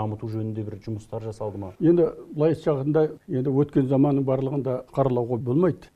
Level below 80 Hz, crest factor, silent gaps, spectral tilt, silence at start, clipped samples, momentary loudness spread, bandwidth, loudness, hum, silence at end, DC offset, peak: -54 dBFS; 18 dB; none; -10 dB/octave; 0 s; under 0.1%; 12 LU; 9.4 kHz; -24 LUFS; none; 0.1 s; under 0.1%; -6 dBFS